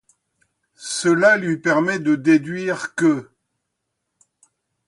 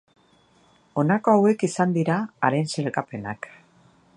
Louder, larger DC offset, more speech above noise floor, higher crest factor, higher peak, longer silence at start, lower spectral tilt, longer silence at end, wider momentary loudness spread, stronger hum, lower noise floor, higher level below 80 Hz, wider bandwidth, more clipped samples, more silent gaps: first, -19 LUFS vs -23 LUFS; neither; first, 59 dB vs 37 dB; about the same, 20 dB vs 20 dB; about the same, -2 dBFS vs -4 dBFS; second, 0.8 s vs 0.95 s; second, -5 dB/octave vs -6.5 dB/octave; first, 1.65 s vs 0.7 s; second, 10 LU vs 15 LU; neither; first, -77 dBFS vs -59 dBFS; about the same, -68 dBFS vs -66 dBFS; about the same, 11.5 kHz vs 11 kHz; neither; neither